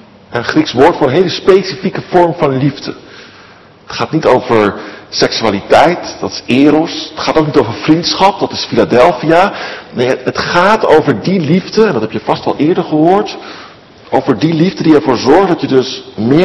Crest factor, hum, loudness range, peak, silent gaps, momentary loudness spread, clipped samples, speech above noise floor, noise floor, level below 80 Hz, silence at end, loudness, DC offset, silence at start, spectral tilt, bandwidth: 12 dB; none; 3 LU; 0 dBFS; none; 11 LU; 2%; 28 dB; -39 dBFS; -44 dBFS; 0 s; -11 LUFS; under 0.1%; 0.3 s; -6 dB/octave; 12 kHz